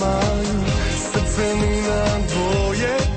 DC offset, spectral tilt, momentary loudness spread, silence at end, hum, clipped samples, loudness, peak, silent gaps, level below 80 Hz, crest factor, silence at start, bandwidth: under 0.1%; -5 dB/octave; 2 LU; 0 s; none; under 0.1%; -20 LUFS; -8 dBFS; none; -26 dBFS; 12 dB; 0 s; 8.8 kHz